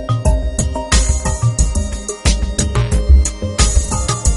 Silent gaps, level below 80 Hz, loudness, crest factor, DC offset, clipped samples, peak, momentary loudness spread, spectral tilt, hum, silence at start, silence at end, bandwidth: none; -16 dBFS; -16 LUFS; 14 dB; under 0.1%; under 0.1%; 0 dBFS; 6 LU; -4 dB/octave; none; 0 s; 0 s; 11.5 kHz